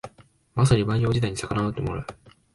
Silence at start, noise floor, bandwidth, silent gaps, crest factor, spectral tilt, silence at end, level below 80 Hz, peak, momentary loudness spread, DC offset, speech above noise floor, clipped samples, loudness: 0.05 s; -53 dBFS; 11.5 kHz; none; 20 dB; -6.5 dB/octave; 0.4 s; -44 dBFS; -6 dBFS; 15 LU; under 0.1%; 30 dB; under 0.1%; -24 LUFS